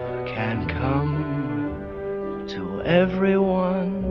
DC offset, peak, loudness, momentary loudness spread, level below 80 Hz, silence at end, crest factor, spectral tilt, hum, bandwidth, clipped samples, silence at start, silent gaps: under 0.1%; -6 dBFS; -24 LUFS; 10 LU; -42 dBFS; 0 s; 18 dB; -9 dB/octave; none; 6.2 kHz; under 0.1%; 0 s; none